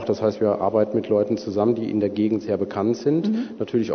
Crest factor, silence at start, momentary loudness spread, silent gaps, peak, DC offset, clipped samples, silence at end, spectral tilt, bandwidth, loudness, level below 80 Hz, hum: 16 dB; 0 s; 4 LU; none; -6 dBFS; under 0.1%; under 0.1%; 0 s; -8 dB/octave; 6.6 kHz; -22 LUFS; -64 dBFS; none